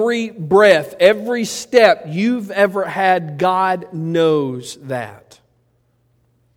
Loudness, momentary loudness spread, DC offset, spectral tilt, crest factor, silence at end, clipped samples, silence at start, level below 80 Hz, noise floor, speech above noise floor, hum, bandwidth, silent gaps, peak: -16 LUFS; 14 LU; under 0.1%; -5 dB/octave; 16 dB; 1.4 s; under 0.1%; 0 s; -60 dBFS; -61 dBFS; 45 dB; none; 16.5 kHz; none; 0 dBFS